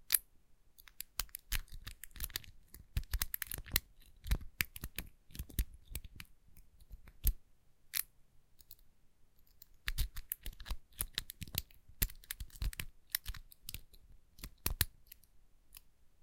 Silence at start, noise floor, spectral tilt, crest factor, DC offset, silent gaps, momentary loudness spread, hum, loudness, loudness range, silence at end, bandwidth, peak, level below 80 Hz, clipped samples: 0.1 s; -64 dBFS; -2 dB/octave; 38 dB; under 0.1%; none; 22 LU; none; -41 LUFS; 4 LU; 0.15 s; 17 kHz; -4 dBFS; -46 dBFS; under 0.1%